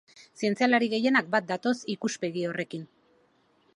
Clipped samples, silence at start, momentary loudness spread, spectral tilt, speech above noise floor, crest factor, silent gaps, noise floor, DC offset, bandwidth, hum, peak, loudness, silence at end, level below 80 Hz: under 0.1%; 0.4 s; 9 LU; -4.5 dB/octave; 39 dB; 20 dB; none; -66 dBFS; under 0.1%; 11 kHz; none; -8 dBFS; -27 LUFS; 0.95 s; -78 dBFS